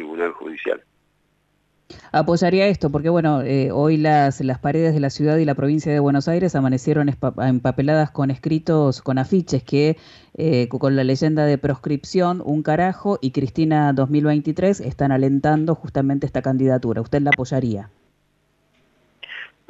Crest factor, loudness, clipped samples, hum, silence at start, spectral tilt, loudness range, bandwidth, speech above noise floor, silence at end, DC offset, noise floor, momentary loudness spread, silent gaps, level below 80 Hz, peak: 14 dB; -19 LUFS; under 0.1%; 50 Hz at -40 dBFS; 0 s; -7.5 dB/octave; 3 LU; 8 kHz; 46 dB; 0.25 s; under 0.1%; -65 dBFS; 6 LU; none; -50 dBFS; -6 dBFS